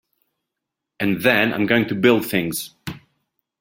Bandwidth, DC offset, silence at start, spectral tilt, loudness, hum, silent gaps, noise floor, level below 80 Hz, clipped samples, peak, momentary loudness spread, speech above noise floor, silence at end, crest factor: 17 kHz; under 0.1%; 1 s; -5 dB/octave; -19 LUFS; none; none; -83 dBFS; -56 dBFS; under 0.1%; -2 dBFS; 15 LU; 63 dB; 0.6 s; 20 dB